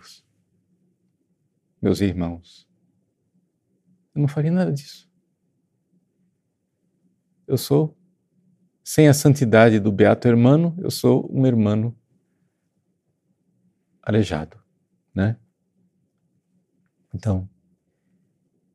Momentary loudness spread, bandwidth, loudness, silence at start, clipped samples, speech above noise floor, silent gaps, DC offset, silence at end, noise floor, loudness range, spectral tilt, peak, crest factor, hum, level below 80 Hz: 18 LU; 15 kHz; -20 LUFS; 1.8 s; under 0.1%; 55 dB; none; under 0.1%; 1.3 s; -73 dBFS; 13 LU; -7 dB/octave; -2 dBFS; 22 dB; none; -56 dBFS